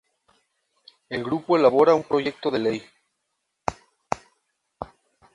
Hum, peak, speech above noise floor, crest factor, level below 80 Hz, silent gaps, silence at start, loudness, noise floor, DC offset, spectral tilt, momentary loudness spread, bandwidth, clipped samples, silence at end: none; -2 dBFS; 57 dB; 22 dB; -58 dBFS; none; 1.1 s; -23 LUFS; -78 dBFS; under 0.1%; -6 dB/octave; 21 LU; 11 kHz; under 0.1%; 0.5 s